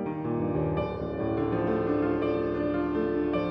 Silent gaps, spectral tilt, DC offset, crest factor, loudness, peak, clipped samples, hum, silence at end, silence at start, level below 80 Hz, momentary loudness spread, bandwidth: none; -10 dB/octave; under 0.1%; 12 dB; -28 LUFS; -16 dBFS; under 0.1%; none; 0 s; 0 s; -46 dBFS; 4 LU; 5.8 kHz